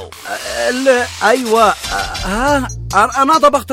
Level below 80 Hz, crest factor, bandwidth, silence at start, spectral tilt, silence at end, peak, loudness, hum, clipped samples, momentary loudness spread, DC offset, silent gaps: -34 dBFS; 14 dB; 16.5 kHz; 0 s; -3.5 dB/octave; 0 s; 0 dBFS; -14 LUFS; none; under 0.1%; 8 LU; under 0.1%; none